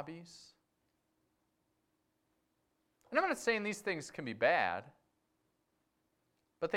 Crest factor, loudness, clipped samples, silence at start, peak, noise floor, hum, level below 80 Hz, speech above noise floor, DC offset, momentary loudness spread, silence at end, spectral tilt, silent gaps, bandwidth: 24 dB; -35 LUFS; under 0.1%; 0 s; -16 dBFS; -81 dBFS; none; -78 dBFS; 45 dB; under 0.1%; 16 LU; 0 s; -4 dB/octave; none; 16 kHz